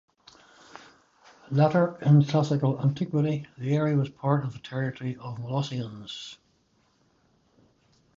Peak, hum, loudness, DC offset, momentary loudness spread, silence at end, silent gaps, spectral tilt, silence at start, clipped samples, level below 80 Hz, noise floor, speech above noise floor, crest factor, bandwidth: -8 dBFS; none; -26 LUFS; under 0.1%; 16 LU; 1.8 s; none; -8 dB/octave; 0.75 s; under 0.1%; -66 dBFS; -67 dBFS; 42 dB; 18 dB; 7.4 kHz